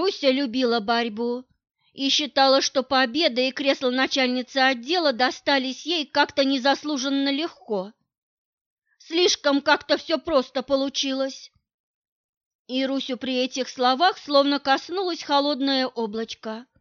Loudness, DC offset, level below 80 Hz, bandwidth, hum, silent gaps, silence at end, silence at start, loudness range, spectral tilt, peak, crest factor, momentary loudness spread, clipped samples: -23 LUFS; under 0.1%; -66 dBFS; 7.2 kHz; none; 8.18-8.77 s, 11.74-12.02 s, 12.08-12.65 s; 0.2 s; 0 s; 5 LU; -2 dB/octave; -6 dBFS; 18 dB; 9 LU; under 0.1%